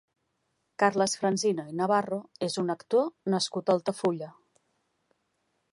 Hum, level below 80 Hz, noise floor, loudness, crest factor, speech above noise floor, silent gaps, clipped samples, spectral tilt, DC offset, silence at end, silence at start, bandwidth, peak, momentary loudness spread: none; -78 dBFS; -77 dBFS; -28 LUFS; 22 dB; 49 dB; none; under 0.1%; -4.5 dB/octave; under 0.1%; 1.4 s; 0.8 s; 11.5 kHz; -8 dBFS; 7 LU